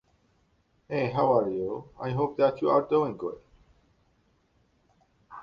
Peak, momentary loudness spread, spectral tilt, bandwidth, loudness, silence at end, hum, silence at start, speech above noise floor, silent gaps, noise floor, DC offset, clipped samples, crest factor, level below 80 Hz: -8 dBFS; 13 LU; -9 dB/octave; 6.6 kHz; -27 LUFS; 0 s; none; 0.9 s; 42 dB; none; -68 dBFS; under 0.1%; under 0.1%; 20 dB; -62 dBFS